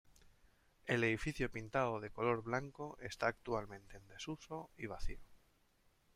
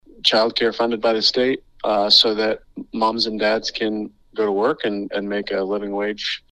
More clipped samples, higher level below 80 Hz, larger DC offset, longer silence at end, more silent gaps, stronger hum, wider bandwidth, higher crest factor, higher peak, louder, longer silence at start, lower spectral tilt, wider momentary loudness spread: neither; about the same, -56 dBFS vs -54 dBFS; neither; first, 0.8 s vs 0.15 s; neither; neither; first, 15 kHz vs 13 kHz; about the same, 22 dB vs 20 dB; second, -20 dBFS vs 0 dBFS; second, -41 LUFS vs -20 LUFS; about the same, 0.2 s vs 0.15 s; first, -5.5 dB/octave vs -3.5 dB/octave; first, 15 LU vs 12 LU